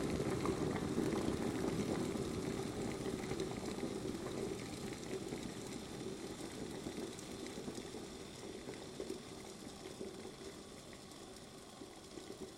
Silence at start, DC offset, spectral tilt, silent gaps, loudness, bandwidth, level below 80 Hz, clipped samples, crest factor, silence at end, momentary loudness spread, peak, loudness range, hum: 0 s; under 0.1%; -5 dB/octave; none; -44 LUFS; 16 kHz; -62 dBFS; under 0.1%; 20 dB; 0 s; 14 LU; -24 dBFS; 10 LU; none